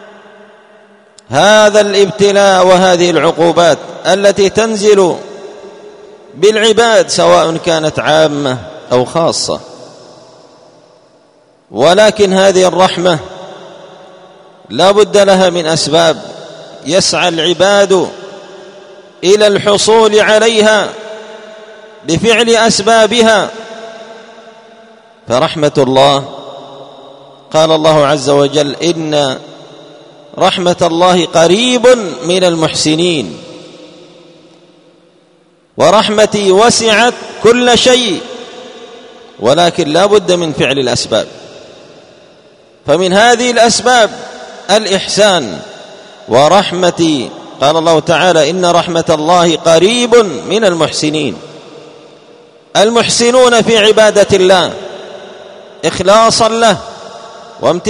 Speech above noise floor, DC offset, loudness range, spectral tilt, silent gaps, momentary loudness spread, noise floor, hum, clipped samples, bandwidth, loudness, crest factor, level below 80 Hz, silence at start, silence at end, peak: 40 dB; under 0.1%; 5 LU; -3.5 dB/octave; none; 19 LU; -49 dBFS; none; 0.8%; 13 kHz; -9 LUFS; 10 dB; -48 dBFS; 1.3 s; 0 s; 0 dBFS